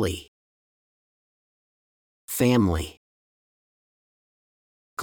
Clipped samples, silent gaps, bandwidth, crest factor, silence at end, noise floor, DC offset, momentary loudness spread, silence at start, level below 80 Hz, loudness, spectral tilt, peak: under 0.1%; 0.28-2.28 s, 2.97-4.97 s; over 20 kHz; 22 dB; 0 s; under -90 dBFS; under 0.1%; 17 LU; 0 s; -50 dBFS; -24 LUFS; -5.5 dB/octave; -8 dBFS